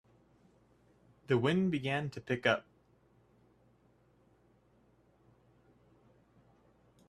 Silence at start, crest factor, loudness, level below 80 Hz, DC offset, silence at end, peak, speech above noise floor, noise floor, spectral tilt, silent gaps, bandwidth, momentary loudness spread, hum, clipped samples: 1.3 s; 26 dB; -33 LUFS; -72 dBFS; under 0.1%; 4.45 s; -14 dBFS; 36 dB; -68 dBFS; -6.5 dB/octave; none; 11.5 kHz; 6 LU; none; under 0.1%